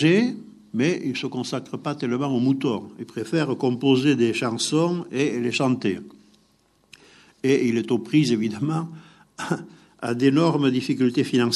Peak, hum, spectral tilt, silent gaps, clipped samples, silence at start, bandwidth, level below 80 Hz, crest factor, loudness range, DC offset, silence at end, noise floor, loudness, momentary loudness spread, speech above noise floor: -6 dBFS; none; -5.5 dB/octave; none; under 0.1%; 0 s; 12 kHz; -70 dBFS; 18 dB; 3 LU; under 0.1%; 0 s; -62 dBFS; -23 LUFS; 11 LU; 40 dB